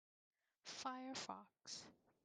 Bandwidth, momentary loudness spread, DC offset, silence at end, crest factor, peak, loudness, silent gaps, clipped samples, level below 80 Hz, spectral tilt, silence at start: 10.5 kHz; 10 LU; under 0.1%; 0.3 s; 20 dB; -34 dBFS; -52 LUFS; none; under 0.1%; under -90 dBFS; -1.5 dB/octave; 0.65 s